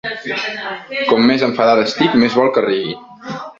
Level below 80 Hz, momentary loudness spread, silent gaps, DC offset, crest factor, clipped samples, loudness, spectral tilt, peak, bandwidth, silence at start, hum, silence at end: -56 dBFS; 13 LU; none; under 0.1%; 14 dB; under 0.1%; -15 LUFS; -5.5 dB/octave; -2 dBFS; 7.6 kHz; 0.05 s; none; 0.05 s